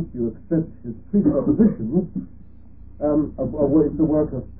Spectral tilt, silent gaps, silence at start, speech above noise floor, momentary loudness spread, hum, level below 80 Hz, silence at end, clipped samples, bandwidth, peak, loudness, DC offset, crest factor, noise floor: -16 dB/octave; none; 0 s; 24 dB; 11 LU; none; -42 dBFS; 0 s; under 0.1%; 2.1 kHz; -4 dBFS; -21 LUFS; 0.8%; 16 dB; -45 dBFS